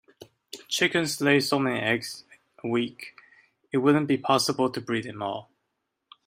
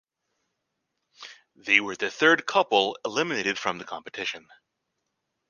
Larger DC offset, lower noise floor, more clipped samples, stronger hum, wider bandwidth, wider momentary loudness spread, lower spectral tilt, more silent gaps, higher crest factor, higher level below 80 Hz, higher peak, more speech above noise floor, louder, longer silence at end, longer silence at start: neither; about the same, -80 dBFS vs -80 dBFS; neither; neither; first, 16 kHz vs 9.8 kHz; second, 17 LU vs 23 LU; first, -4 dB/octave vs -2.5 dB/octave; neither; second, 20 dB vs 26 dB; about the same, -70 dBFS vs -74 dBFS; about the same, -6 dBFS vs -4 dBFS; about the same, 55 dB vs 55 dB; about the same, -25 LUFS vs -24 LUFS; second, 0.85 s vs 1.1 s; second, 0.2 s vs 1.2 s